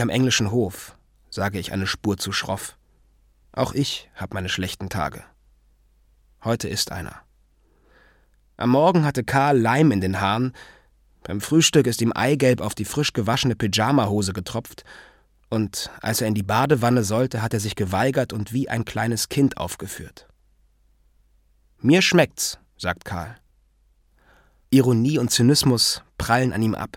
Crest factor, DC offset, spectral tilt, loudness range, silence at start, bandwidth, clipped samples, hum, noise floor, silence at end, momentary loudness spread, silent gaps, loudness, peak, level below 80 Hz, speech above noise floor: 20 dB; under 0.1%; -4.5 dB/octave; 8 LU; 0 s; 17.5 kHz; under 0.1%; none; -61 dBFS; 0 s; 14 LU; none; -22 LUFS; -2 dBFS; -50 dBFS; 39 dB